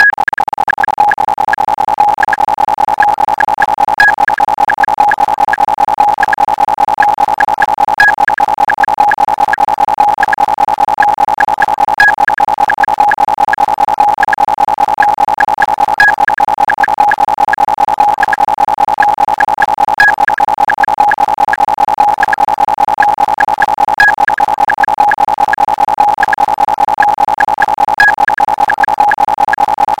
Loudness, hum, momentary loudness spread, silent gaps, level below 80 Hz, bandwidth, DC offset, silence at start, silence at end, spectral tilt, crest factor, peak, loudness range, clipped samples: -10 LUFS; none; 4 LU; none; -42 dBFS; 16.5 kHz; 0.7%; 0 s; 0.05 s; -3 dB/octave; 10 dB; 0 dBFS; 1 LU; 0.5%